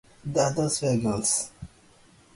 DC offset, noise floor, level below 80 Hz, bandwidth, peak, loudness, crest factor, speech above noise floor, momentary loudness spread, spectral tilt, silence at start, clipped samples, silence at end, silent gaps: under 0.1%; -56 dBFS; -54 dBFS; 11.5 kHz; -10 dBFS; -25 LUFS; 18 dB; 31 dB; 17 LU; -4.5 dB/octave; 0.25 s; under 0.1%; 0.7 s; none